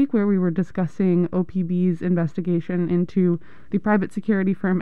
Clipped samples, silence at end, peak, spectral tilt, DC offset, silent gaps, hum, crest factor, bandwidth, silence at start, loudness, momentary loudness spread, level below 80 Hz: under 0.1%; 0 s; -8 dBFS; -10 dB/octave; 1%; none; none; 12 dB; 4.3 kHz; 0 s; -22 LUFS; 4 LU; -56 dBFS